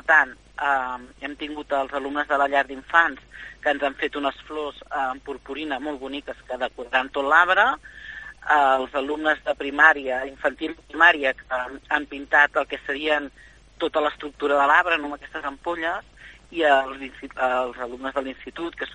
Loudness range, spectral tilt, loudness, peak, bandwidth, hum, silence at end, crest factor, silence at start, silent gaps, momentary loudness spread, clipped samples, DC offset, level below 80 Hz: 6 LU; -3.5 dB/octave; -23 LUFS; 0 dBFS; 10 kHz; none; 0 s; 22 dB; 0.05 s; none; 16 LU; under 0.1%; under 0.1%; -54 dBFS